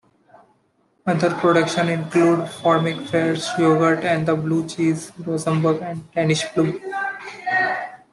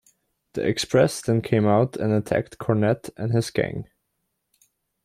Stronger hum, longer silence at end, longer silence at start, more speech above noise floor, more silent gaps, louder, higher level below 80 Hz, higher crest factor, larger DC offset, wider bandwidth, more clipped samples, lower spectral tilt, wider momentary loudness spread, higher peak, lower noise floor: neither; second, 0.15 s vs 1.2 s; first, 1.05 s vs 0.55 s; second, 44 dB vs 54 dB; neither; first, -20 LUFS vs -23 LUFS; second, -62 dBFS vs -56 dBFS; about the same, 18 dB vs 18 dB; neither; second, 12 kHz vs 15 kHz; neither; about the same, -6 dB/octave vs -6 dB/octave; about the same, 9 LU vs 7 LU; about the same, -4 dBFS vs -6 dBFS; second, -63 dBFS vs -76 dBFS